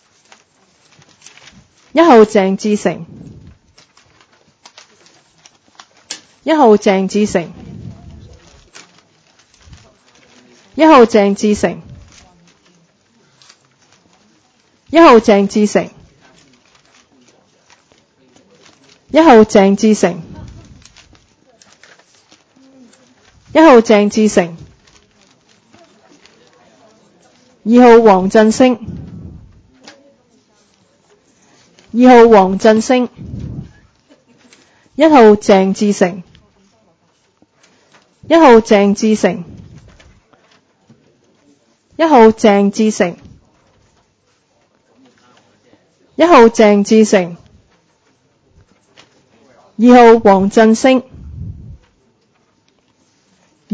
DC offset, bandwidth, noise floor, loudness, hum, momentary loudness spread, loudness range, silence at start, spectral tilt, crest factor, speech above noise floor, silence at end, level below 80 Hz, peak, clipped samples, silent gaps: under 0.1%; 8 kHz; -58 dBFS; -9 LUFS; none; 24 LU; 9 LU; 1.95 s; -5.5 dB/octave; 14 dB; 50 dB; 2.25 s; -46 dBFS; 0 dBFS; 0.4%; none